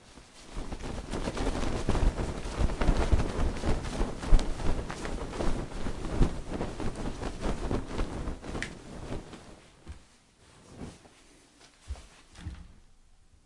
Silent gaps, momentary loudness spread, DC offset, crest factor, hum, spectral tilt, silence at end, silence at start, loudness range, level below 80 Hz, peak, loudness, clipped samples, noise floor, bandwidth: none; 20 LU; under 0.1%; 24 dB; none; -6 dB/octave; 0.7 s; 0.1 s; 17 LU; -34 dBFS; -8 dBFS; -34 LUFS; under 0.1%; -59 dBFS; 11.5 kHz